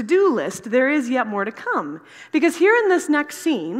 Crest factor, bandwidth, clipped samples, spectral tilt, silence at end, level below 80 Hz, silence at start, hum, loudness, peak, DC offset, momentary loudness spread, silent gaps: 14 dB; 15.5 kHz; under 0.1%; -4.5 dB/octave; 0 s; -76 dBFS; 0 s; none; -20 LUFS; -4 dBFS; under 0.1%; 9 LU; none